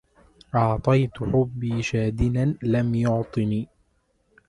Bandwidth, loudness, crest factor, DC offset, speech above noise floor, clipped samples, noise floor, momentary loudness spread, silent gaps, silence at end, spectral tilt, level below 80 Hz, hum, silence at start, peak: 10.5 kHz; -24 LUFS; 18 dB; under 0.1%; 45 dB; under 0.1%; -68 dBFS; 5 LU; none; 0.85 s; -8 dB/octave; -42 dBFS; none; 0.55 s; -6 dBFS